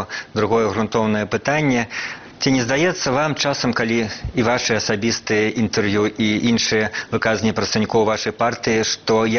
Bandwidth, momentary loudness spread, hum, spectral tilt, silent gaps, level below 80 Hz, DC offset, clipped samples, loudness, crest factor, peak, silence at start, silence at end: 6.8 kHz; 4 LU; none; -3.5 dB/octave; none; -46 dBFS; under 0.1%; under 0.1%; -19 LUFS; 16 dB; -2 dBFS; 0 s; 0 s